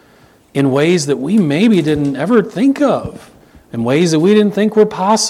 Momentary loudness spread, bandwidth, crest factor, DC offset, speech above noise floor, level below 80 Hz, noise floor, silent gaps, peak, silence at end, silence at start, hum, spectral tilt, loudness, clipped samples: 8 LU; 13.5 kHz; 14 dB; under 0.1%; 35 dB; -48 dBFS; -47 dBFS; none; 0 dBFS; 0 s; 0.55 s; none; -5.5 dB/octave; -13 LUFS; under 0.1%